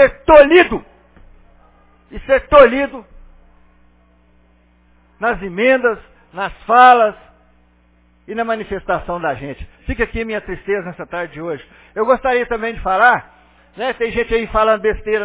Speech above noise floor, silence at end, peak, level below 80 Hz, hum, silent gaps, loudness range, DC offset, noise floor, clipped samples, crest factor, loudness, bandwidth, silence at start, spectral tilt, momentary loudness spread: 38 dB; 0 s; 0 dBFS; -38 dBFS; 60 Hz at -55 dBFS; none; 7 LU; under 0.1%; -53 dBFS; 0.1%; 16 dB; -15 LUFS; 4 kHz; 0 s; -8.5 dB/octave; 18 LU